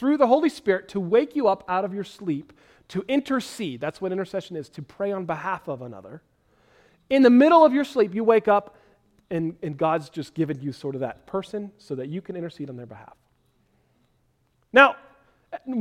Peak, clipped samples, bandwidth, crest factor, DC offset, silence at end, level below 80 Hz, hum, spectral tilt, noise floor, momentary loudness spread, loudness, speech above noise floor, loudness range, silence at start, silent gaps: 0 dBFS; under 0.1%; 13.5 kHz; 24 dB; under 0.1%; 0 s; -64 dBFS; none; -6.5 dB/octave; -67 dBFS; 19 LU; -23 LUFS; 44 dB; 12 LU; 0 s; none